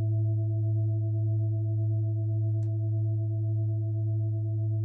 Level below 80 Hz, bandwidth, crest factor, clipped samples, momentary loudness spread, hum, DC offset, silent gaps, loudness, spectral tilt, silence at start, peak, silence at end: -72 dBFS; 0.7 kHz; 6 dB; under 0.1%; 2 LU; 50 Hz at -70 dBFS; under 0.1%; none; -29 LUFS; -14 dB/octave; 0 s; -22 dBFS; 0 s